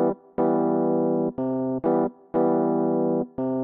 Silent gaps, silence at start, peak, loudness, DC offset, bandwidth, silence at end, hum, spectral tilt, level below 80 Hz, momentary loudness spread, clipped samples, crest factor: none; 0 s; -10 dBFS; -24 LUFS; under 0.1%; 2.8 kHz; 0 s; none; -11 dB/octave; -64 dBFS; 5 LU; under 0.1%; 12 dB